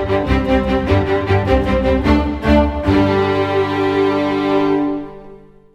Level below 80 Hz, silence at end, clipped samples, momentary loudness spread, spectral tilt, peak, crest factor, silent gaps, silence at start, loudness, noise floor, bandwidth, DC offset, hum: -26 dBFS; 0.35 s; under 0.1%; 3 LU; -8 dB/octave; 0 dBFS; 14 dB; none; 0 s; -16 LUFS; -40 dBFS; 9.6 kHz; under 0.1%; none